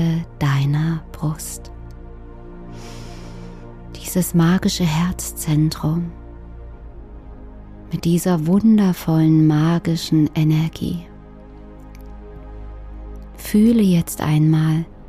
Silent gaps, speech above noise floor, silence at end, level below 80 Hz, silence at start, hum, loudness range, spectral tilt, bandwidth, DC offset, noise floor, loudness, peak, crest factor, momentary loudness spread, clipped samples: none; 22 dB; 0 s; -38 dBFS; 0 s; none; 9 LU; -6.5 dB/octave; 15.5 kHz; under 0.1%; -39 dBFS; -18 LUFS; -6 dBFS; 14 dB; 25 LU; under 0.1%